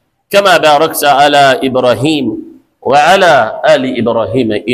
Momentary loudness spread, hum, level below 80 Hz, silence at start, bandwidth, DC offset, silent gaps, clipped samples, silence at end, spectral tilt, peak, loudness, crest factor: 7 LU; none; -48 dBFS; 0.3 s; 16 kHz; under 0.1%; none; under 0.1%; 0 s; -4 dB/octave; 0 dBFS; -9 LUFS; 10 dB